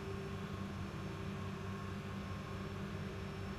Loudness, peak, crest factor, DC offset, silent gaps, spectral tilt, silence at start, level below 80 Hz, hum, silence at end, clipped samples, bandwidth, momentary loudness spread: -45 LUFS; -32 dBFS; 12 dB; under 0.1%; none; -6.5 dB/octave; 0 s; -56 dBFS; 50 Hz at -50 dBFS; 0 s; under 0.1%; 14 kHz; 1 LU